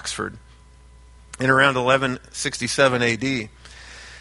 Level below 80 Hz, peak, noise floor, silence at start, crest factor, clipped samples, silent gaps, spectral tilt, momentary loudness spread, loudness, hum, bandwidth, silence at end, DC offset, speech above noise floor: -48 dBFS; -2 dBFS; -48 dBFS; 0 s; 22 dB; under 0.1%; none; -4 dB/octave; 21 LU; -20 LUFS; none; 11.5 kHz; 0 s; under 0.1%; 27 dB